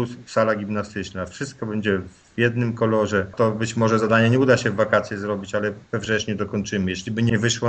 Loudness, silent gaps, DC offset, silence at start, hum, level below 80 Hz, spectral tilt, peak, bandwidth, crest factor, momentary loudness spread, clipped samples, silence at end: -22 LUFS; none; under 0.1%; 0 s; none; -54 dBFS; -5.5 dB/octave; -2 dBFS; 8.8 kHz; 20 dB; 11 LU; under 0.1%; 0 s